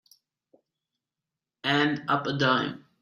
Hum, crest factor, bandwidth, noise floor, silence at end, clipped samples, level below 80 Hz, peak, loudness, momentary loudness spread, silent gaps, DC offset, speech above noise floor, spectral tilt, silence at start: none; 20 dB; 12 kHz; -89 dBFS; 0.25 s; under 0.1%; -70 dBFS; -10 dBFS; -26 LUFS; 7 LU; none; under 0.1%; 63 dB; -5.5 dB/octave; 1.65 s